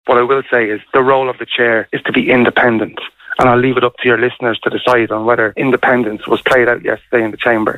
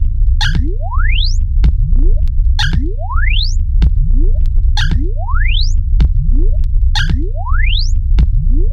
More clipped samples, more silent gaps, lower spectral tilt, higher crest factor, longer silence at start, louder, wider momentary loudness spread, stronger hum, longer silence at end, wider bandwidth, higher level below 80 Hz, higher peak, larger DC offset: neither; neither; first, -6.5 dB/octave vs -5 dB/octave; about the same, 12 dB vs 10 dB; about the same, 0.05 s vs 0 s; first, -13 LUFS vs -16 LUFS; first, 6 LU vs 3 LU; neither; about the same, 0 s vs 0 s; first, 12.5 kHz vs 7 kHz; second, -46 dBFS vs -10 dBFS; about the same, 0 dBFS vs -2 dBFS; neither